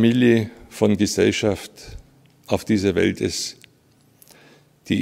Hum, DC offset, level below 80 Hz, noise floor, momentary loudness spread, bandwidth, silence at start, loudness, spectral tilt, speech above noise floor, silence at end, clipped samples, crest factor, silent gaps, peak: none; under 0.1%; -50 dBFS; -57 dBFS; 14 LU; 16 kHz; 0 s; -21 LUFS; -5 dB/octave; 38 dB; 0 s; under 0.1%; 20 dB; none; -2 dBFS